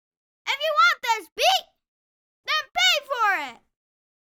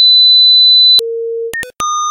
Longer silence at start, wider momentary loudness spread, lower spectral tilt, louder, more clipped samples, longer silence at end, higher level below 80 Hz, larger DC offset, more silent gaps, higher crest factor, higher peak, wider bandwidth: first, 0.45 s vs 0 s; second, 11 LU vs 16 LU; about the same, 2.5 dB/octave vs 2 dB/octave; second, -22 LUFS vs -4 LUFS; neither; first, 0.85 s vs 0 s; second, -70 dBFS vs -52 dBFS; neither; first, 1.32-1.36 s, 1.88-2.44 s vs none; first, 18 dB vs 8 dB; second, -8 dBFS vs 0 dBFS; first, over 20 kHz vs 16.5 kHz